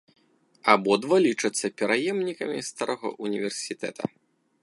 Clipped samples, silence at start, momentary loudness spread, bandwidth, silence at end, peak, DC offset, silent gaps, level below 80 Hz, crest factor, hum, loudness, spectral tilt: under 0.1%; 0.65 s; 11 LU; 11.5 kHz; 0.55 s; -2 dBFS; under 0.1%; none; -74 dBFS; 24 dB; none; -26 LUFS; -3.5 dB/octave